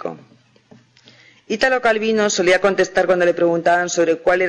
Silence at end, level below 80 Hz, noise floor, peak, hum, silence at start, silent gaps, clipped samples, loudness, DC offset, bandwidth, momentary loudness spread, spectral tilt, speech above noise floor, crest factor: 0 s; -54 dBFS; -50 dBFS; -6 dBFS; none; 0 s; none; under 0.1%; -17 LUFS; under 0.1%; 10 kHz; 3 LU; -3.5 dB/octave; 34 dB; 12 dB